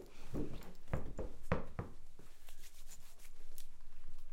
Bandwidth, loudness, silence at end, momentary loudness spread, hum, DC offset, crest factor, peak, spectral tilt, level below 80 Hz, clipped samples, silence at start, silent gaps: 13 kHz; -48 LUFS; 0 s; 18 LU; none; under 0.1%; 20 dB; -18 dBFS; -6.5 dB/octave; -46 dBFS; under 0.1%; 0 s; none